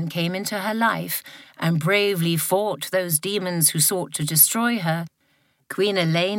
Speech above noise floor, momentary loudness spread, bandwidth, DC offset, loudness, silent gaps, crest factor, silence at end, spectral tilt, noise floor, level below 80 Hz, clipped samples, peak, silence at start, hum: 43 dB; 11 LU; 17 kHz; under 0.1%; -21 LUFS; none; 20 dB; 0 s; -3.5 dB/octave; -65 dBFS; -70 dBFS; under 0.1%; -2 dBFS; 0 s; none